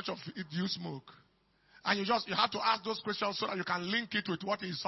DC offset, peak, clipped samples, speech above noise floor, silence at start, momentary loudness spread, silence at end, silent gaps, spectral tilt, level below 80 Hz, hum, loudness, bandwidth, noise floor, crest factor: under 0.1%; -12 dBFS; under 0.1%; 34 dB; 0 s; 10 LU; 0 s; none; -2 dB/octave; -74 dBFS; none; -34 LUFS; 6 kHz; -69 dBFS; 22 dB